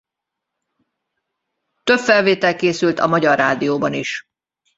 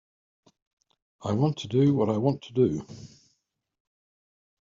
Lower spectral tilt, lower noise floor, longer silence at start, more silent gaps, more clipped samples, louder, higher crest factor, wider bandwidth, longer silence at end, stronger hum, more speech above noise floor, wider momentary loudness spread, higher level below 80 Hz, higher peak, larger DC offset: second, -5 dB/octave vs -8.5 dB/octave; first, -82 dBFS vs -76 dBFS; first, 1.85 s vs 1.2 s; neither; neither; first, -17 LUFS vs -26 LUFS; about the same, 18 dB vs 20 dB; about the same, 8 kHz vs 7.6 kHz; second, 0.55 s vs 1.6 s; neither; first, 66 dB vs 51 dB; second, 11 LU vs 15 LU; about the same, -60 dBFS vs -64 dBFS; first, -2 dBFS vs -10 dBFS; neither